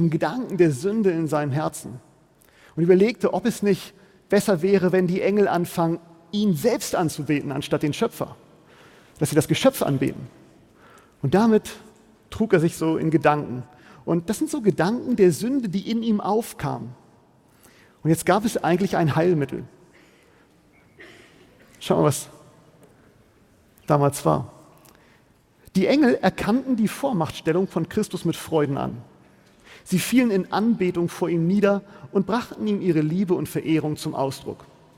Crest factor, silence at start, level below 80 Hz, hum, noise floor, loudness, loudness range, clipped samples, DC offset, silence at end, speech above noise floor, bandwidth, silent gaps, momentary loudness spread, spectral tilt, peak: 20 dB; 0 s; -56 dBFS; none; -58 dBFS; -22 LUFS; 4 LU; under 0.1%; under 0.1%; 0.35 s; 36 dB; 17 kHz; none; 13 LU; -6 dB/octave; -4 dBFS